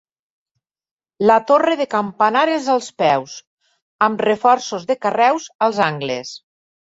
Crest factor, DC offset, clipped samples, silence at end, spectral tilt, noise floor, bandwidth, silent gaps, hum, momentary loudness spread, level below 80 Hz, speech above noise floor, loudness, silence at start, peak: 16 dB; under 0.1%; under 0.1%; 0.5 s; -4.5 dB/octave; -78 dBFS; 8 kHz; 3.47-3.57 s, 3.82-3.99 s, 5.55-5.59 s; none; 10 LU; -64 dBFS; 61 dB; -17 LUFS; 1.2 s; -2 dBFS